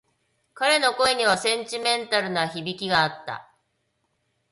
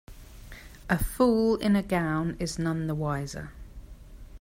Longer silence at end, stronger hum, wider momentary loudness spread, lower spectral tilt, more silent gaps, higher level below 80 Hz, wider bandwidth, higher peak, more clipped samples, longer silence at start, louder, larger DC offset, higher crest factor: first, 1.1 s vs 0.05 s; neither; second, 10 LU vs 23 LU; second, -2.5 dB/octave vs -6.5 dB/octave; neither; second, -64 dBFS vs -42 dBFS; second, 11.5 kHz vs 16 kHz; first, -6 dBFS vs -10 dBFS; neither; first, 0.55 s vs 0.1 s; first, -22 LUFS vs -27 LUFS; neither; about the same, 20 dB vs 18 dB